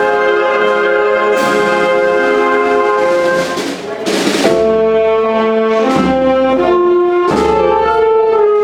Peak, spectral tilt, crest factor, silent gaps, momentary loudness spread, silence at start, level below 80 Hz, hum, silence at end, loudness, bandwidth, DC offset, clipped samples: 0 dBFS; -4.5 dB/octave; 12 dB; none; 3 LU; 0 s; -40 dBFS; none; 0 s; -12 LUFS; 15 kHz; under 0.1%; under 0.1%